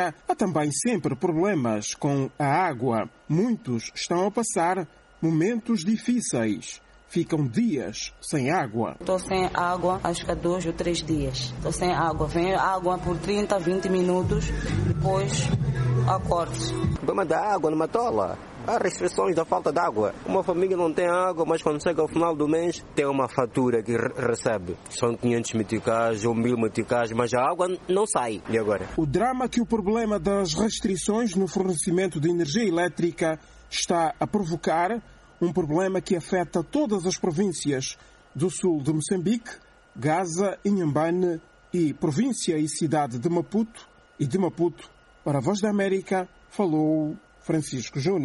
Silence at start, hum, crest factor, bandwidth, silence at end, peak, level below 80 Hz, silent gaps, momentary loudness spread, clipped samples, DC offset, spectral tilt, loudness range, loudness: 0 s; none; 20 dB; 11.5 kHz; 0 s; -6 dBFS; -46 dBFS; none; 5 LU; under 0.1%; under 0.1%; -5.5 dB/octave; 2 LU; -25 LUFS